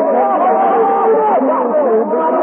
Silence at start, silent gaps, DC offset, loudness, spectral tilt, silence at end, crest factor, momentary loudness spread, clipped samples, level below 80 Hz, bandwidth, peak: 0 s; none; under 0.1%; -13 LUFS; -12 dB/octave; 0 s; 8 dB; 2 LU; under 0.1%; -82 dBFS; 3.4 kHz; -4 dBFS